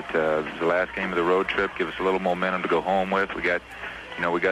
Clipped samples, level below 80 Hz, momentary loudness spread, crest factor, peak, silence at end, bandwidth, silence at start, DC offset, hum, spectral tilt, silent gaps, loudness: under 0.1%; -52 dBFS; 6 LU; 16 dB; -8 dBFS; 0 s; 12.5 kHz; 0 s; under 0.1%; none; -6 dB/octave; none; -25 LUFS